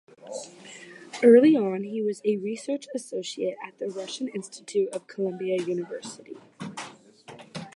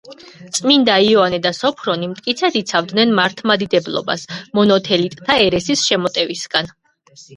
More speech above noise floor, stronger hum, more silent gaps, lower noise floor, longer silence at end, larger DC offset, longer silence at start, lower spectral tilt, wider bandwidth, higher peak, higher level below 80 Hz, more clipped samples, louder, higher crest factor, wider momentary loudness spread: second, 23 dB vs 30 dB; neither; neither; about the same, -49 dBFS vs -46 dBFS; about the same, 0.05 s vs 0 s; neither; first, 0.25 s vs 0.05 s; first, -5.5 dB/octave vs -3.5 dB/octave; about the same, 11.5 kHz vs 11.5 kHz; second, -6 dBFS vs 0 dBFS; second, -80 dBFS vs -54 dBFS; neither; second, -25 LUFS vs -16 LUFS; about the same, 20 dB vs 16 dB; first, 23 LU vs 9 LU